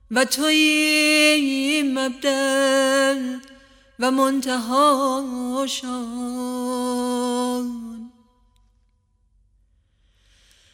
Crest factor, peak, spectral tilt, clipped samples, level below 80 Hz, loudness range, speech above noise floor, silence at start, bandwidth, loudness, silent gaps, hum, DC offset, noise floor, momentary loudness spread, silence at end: 18 dB; -4 dBFS; -1.5 dB/octave; under 0.1%; -60 dBFS; 11 LU; 43 dB; 0.1 s; 17 kHz; -20 LUFS; none; none; under 0.1%; -64 dBFS; 13 LU; 2.65 s